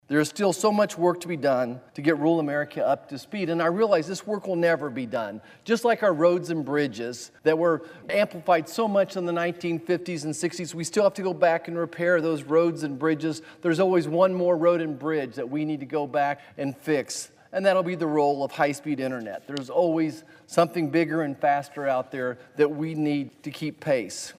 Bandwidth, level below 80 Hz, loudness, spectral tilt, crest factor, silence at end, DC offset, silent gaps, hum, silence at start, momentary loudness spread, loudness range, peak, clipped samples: 15.5 kHz; -74 dBFS; -25 LUFS; -5.5 dB/octave; 18 dB; 0.05 s; under 0.1%; none; none; 0.1 s; 9 LU; 2 LU; -8 dBFS; under 0.1%